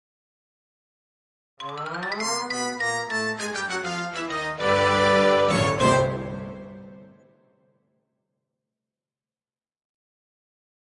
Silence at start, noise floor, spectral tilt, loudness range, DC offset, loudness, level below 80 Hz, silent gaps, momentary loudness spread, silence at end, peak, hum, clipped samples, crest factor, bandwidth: 1.6 s; under -90 dBFS; -4 dB/octave; 8 LU; under 0.1%; -23 LUFS; -56 dBFS; none; 17 LU; 3.85 s; -8 dBFS; none; under 0.1%; 20 dB; 11.5 kHz